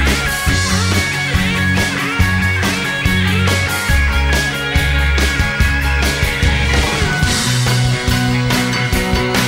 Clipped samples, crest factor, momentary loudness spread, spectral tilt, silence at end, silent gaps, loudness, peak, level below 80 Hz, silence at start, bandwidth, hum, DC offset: under 0.1%; 14 dB; 2 LU; -4 dB/octave; 0 s; none; -15 LUFS; 0 dBFS; -20 dBFS; 0 s; 16.5 kHz; none; under 0.1%